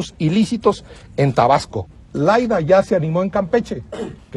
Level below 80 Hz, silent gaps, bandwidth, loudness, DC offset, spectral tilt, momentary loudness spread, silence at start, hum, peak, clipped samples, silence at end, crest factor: -44 dBFS; none; 12 kHz; -17 LUFS; under 0.1%; -7 dB/octave; 15 LU; 0 s; none; -2 dBFS; under 0.1%; 0 s; 16 dB